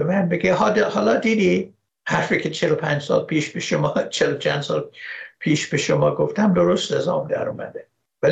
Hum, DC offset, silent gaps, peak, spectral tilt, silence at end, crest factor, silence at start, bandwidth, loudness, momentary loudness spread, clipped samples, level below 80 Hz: none; under 0.1%; none; -6 dBFS; -5.5 dB/octave; 0 s; 14 dB; 0 s; 9 kHz; -20 LUFS; 11 LU; under 0.1%; -58 dBFS